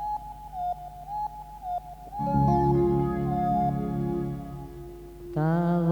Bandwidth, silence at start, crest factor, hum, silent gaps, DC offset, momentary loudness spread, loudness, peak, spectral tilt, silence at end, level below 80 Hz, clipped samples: over 20 kHz; 0 s; 16 dB; none; none; under 0.1%; 17 LU; -28 LUFS; -12 dBFS; -10 dB/octave; 0 s; -42 dBFS; under 0.1%